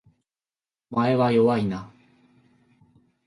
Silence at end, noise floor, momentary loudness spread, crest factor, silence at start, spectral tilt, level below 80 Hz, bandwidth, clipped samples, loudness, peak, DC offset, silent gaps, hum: 1.4 s; under -90 dBFS; 11 LU; 18 dB; 0.9 s; -8.5 dB/octave; -62 dBFS; 11.5 kHz; under 0.1%; -22 LUFS; -10 dBFS; under 0.1%; none; none